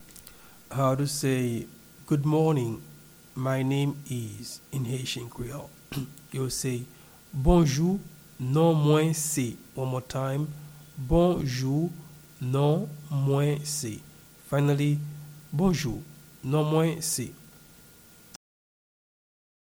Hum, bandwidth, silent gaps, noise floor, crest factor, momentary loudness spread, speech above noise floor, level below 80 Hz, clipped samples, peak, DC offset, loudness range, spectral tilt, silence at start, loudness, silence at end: none; over 20 kHz; none; -53 dBFS; 20 dB; 16 LU; 27 dB; -44 dBFS; under 0.1%; -8 dBFS; under 0.1%; 6 LU; -6 dB/octave; 0 s; -27 LUFS; 2.25 s